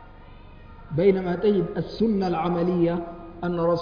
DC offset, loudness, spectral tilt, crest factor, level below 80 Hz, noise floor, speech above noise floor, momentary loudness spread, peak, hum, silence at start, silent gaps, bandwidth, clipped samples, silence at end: under 0.1%; -24 LUFS; -9.5 dB/octave; 16 dB; -46 dBFS; -45 dBFS; 22 dB; 10 LU; -8 dBFS; none; 0 s; none; 5.2 kHz; under 0.1%; 0 s